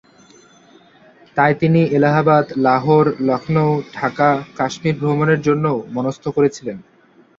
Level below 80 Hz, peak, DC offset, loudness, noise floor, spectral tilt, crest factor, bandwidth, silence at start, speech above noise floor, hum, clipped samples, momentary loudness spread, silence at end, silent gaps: -56 dBFS; -2 dBFS; under 0.1%; -17 LUFS; -51 dBFS; -7.5 dB/octave; 16 dB; 7.6 kHz; 1.35 s; 35 dB; none; under 0.1%; 9 LU; 0.55 s; none